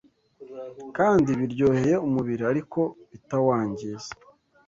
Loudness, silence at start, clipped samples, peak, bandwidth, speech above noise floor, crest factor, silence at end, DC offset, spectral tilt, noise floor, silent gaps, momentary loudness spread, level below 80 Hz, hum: -24 LUFS; 0.4 s; under 0.1%; -8 dBFS; 7.6 kHz; 24 dB; 16 dB; 0.55 s; under 0.1%; -7.5 dB/octave; -49 dBFS; none; 19 LU; -56 dBFS; none